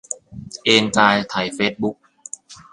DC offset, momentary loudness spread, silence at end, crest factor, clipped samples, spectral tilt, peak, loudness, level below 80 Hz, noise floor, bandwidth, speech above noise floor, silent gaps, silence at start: under 0.1%; 20 LU; 0.15 s; 20 dB; under 0.1%; -3 dB/octave; 0 dBFS; -18 LUFS; -54 dBFS; -39 dBFS; 11.5 kHz; 21 dB; none; 0.1 s